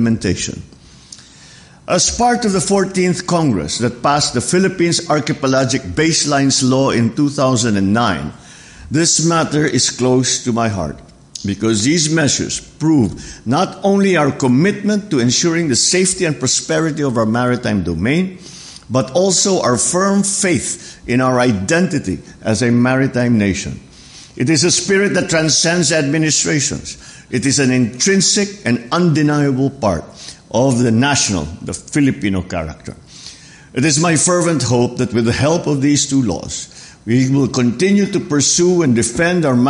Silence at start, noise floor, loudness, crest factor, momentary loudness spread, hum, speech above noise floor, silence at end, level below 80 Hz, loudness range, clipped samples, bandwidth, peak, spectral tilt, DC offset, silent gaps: 0 s; -41 dBFS; -15 LUFS; 12 dB; 12 LU; none; 27 dB; 0 s; -42 dBFS; 2 LU; under 0.1%; 11.5 kHz; -4 dBFS; -4 dB/octave; under 0.1%; none